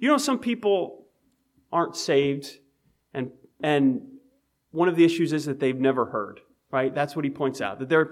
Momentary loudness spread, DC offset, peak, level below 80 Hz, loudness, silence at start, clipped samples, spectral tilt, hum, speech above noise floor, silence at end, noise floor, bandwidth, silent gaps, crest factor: 13 LU; under 0.1%; -8 dBFS; -70 dBFS; -25 LUFS; 0 s; under 0.1%; -5.5 dB/octave; none; 44 dB; 0 s; -68 dBFS; 14.5 kHz; none; 16 dB